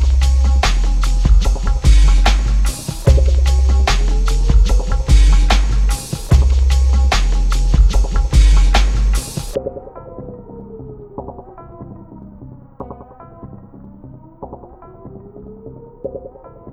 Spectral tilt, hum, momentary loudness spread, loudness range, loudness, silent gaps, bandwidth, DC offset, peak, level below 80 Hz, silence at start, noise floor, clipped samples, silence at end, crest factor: -5 dB/octave; none; 23 LU; 21 LU; -15 LUFS; none; 12.5 kHz; 0.2%; 0 dBFS; -14 dBFS; 0 s; -38 dBFS; under 0.1%; 0 s; 14 dB